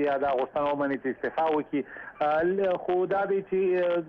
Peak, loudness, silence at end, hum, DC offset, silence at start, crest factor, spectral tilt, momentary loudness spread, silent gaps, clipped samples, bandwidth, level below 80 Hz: -16 dBFS; -27 LUFS; 0 s; none; under 0.1%; 0 s; 10 dB; -8.5 dB/octave; 5 LU; none; under 0.1%; 5.4 kHz; -64 dBFS